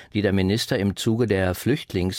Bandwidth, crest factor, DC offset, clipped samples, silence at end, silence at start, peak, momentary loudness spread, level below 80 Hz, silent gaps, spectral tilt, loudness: 16.5 kHz; 16 dB; under 0.1%; under 0.1%; 0 s; 0 s; -8 dBFS; 3 LU; -48 dBFS; none; -6 dB/octave; -23 LUFS